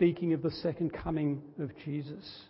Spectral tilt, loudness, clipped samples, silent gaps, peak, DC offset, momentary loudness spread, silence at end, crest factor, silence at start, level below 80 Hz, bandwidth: -11 dB/octave; -34 LUFS; under 0.1%; none; -14 dBFS; under 0.1%; 8 LU; 0.05 s; 18 dB; 0 s; -56 dBFS; 5.8 kHz